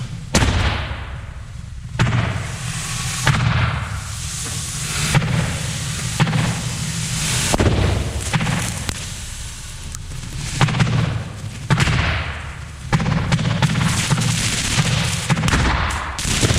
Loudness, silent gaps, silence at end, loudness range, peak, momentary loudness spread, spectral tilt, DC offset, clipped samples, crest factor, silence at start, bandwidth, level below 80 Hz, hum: -20 LUFS; none; 0 s; 4 LU; -2 dBFS; 13 LU; -4 dB/octave; under 0.1%; under 0.1%; 18 dB; 0 s; 15.5 kHz; -30 dBFS; none